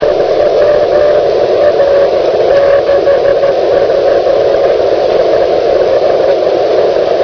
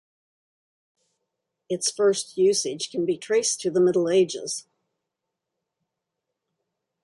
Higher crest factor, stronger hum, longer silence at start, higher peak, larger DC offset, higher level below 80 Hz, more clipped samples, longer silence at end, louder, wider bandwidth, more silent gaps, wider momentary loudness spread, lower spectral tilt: second, 8 dB vs 16 dB; neither; second, 0 s vs 1.7 s; first, 0 dBFS vs -10 dBFS; neither; first, -38 dBFS vs -74 dBFS; first, 0.1% vs under 0.1%; second, 0 s vs 2.45 s; first, -9 LUFS vs -23 LUFS; second, 5.4 kHz vs 11.5 kHz; neither; second, 2 LU vs 9 LU; first, -5.5 dB/octave vs -3.5 dB/octave